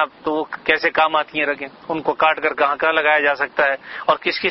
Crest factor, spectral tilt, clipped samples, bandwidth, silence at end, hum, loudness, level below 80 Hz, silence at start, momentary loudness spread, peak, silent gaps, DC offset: 18 dB; -5.5 dB/octave; under 0.1%; 6 kHz; 0 s; none; -18 LUFS; -58 dBFS; 0 s; 8 LU; 0 dBFS; none; under 0.1%